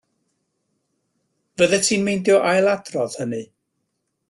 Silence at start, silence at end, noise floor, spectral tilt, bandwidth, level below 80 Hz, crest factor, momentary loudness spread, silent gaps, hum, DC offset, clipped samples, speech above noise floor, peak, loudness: 1.6 s; 0.85 s; -75 dBFS; -3.5 dB/octave; 12.5 kHz; -62 dBFS; 18 dB; 12 LU; none; none; under 0.1%; under 0.1%; 56 dB; -4 dBFS; -19 LUFS